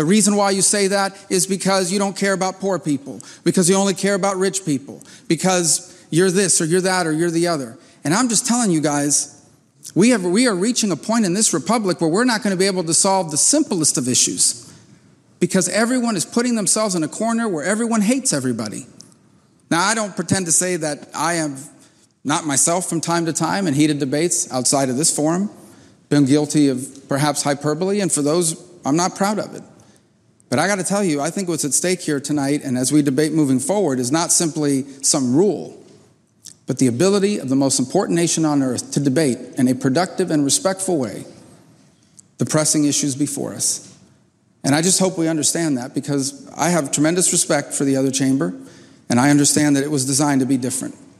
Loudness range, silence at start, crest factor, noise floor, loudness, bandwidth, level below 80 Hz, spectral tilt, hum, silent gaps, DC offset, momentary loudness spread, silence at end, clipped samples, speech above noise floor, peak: 4 LU; 0 s; 16 dB; -57 dBFS; -18 LUFS; 15 kHz; -66 dBFS; -3.5 dB/octave; none; none; under 0.1%; 8 LU; 0.25 s; under 0.1%; 39 dB; -4 dBFS